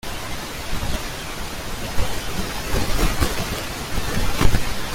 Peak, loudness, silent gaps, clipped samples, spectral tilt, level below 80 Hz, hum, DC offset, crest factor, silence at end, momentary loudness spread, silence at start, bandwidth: -2 dBFS; -25 LUFS; none; under 0.1%; -4 dB/octave; -28 dBFS; none; under 0.1%; 18 dB; 0 s; 8 LU; 0.05 s; 16.5 kHz